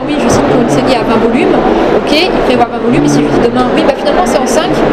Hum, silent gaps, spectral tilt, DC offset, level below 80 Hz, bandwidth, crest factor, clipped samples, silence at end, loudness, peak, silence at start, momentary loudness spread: none; none; -5 dB/octave; under 0.1%; -28 dBFS; 15 kHz; 8 dB; 0.5%; 0 s; -9 LUFS; 0 dBFS; 0 s; 1 LU